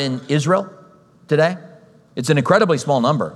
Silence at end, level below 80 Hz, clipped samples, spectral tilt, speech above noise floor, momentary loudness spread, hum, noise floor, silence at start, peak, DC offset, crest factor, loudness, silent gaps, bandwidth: 0 s; -66 dBFS; under 0.1%; -6 dB/octave; 31 dB; 15 LU; none; -48 dBFS; 0 s; 0 dBFS; under 0.1%; 18 dB; -18 LUFS; none; 12.5 kHz